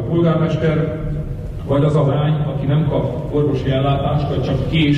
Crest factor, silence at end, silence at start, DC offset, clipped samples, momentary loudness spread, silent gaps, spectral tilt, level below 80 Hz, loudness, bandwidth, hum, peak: 10 dB; 0 s; 0 s; under 0.1%; under 0.1%; 7 LU; none; -8.5 dB/octave; -32 dBFS; -18 LUFS; 8 kHz; none; -6 dBFS